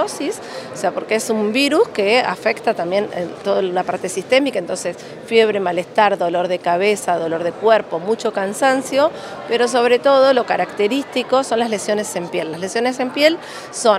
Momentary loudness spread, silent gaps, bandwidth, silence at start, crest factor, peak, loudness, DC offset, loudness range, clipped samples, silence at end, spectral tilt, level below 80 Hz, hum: 9 LU; none; 15.5 kHz; 0 s; 18 dB; 0 dBFS; -18 LUFS; under 0.1%; 3 LU; under 0.1%; 0 s; -3.5 dB/octave; -66 dBFS; none